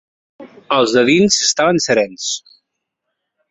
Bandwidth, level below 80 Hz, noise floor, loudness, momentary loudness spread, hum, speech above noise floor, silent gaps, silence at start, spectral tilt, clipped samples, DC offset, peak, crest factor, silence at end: 8.4 kHz; -56 dBFS; -76 dBFS; -14 LUFS; 11 LU; none; 62 dB; none; 0.4 s; -3 dB/octave; under 0.1%; under 0.1%; -2 dBFS; 16 dB; 1.1 s